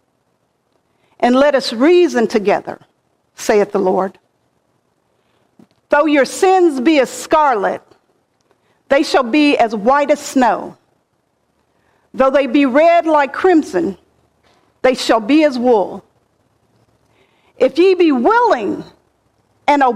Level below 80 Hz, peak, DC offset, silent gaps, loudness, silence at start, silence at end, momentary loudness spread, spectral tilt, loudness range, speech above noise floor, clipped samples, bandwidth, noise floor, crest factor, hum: -54 dBFS; -2 dBFS; under 0.1%; none; -14 LUFS; 1.2 s; 0 s; 10 LU; -4.5 dB/octave; 3 LU; 51 dB; under 0.1%; 15.5 kHz; -64 dBFS; 14 dB; none